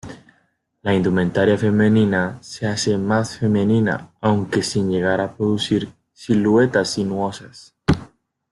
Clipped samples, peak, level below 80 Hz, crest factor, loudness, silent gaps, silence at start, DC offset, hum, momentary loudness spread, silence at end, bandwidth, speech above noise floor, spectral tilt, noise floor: under 0.1%; -2 dBFS; -48 dBFS; 18 dB; -19 LUFS; none; 0.05 s; under 0.1%; none; 10 LU; 0.45 s; 11.5 kHz; 46 dB; -6 dB/octave; -64 dBFS